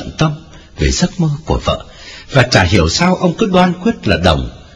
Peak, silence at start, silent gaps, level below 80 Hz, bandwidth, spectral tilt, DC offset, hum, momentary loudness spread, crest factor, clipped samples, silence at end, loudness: 0 dBFS; 0 s; none; -26 dBFS; 11 kHz; -5 dB/octave; under 0.1%; none; 9 LU; 14 dB; 0.5%; 0.1 s; -14 LUFS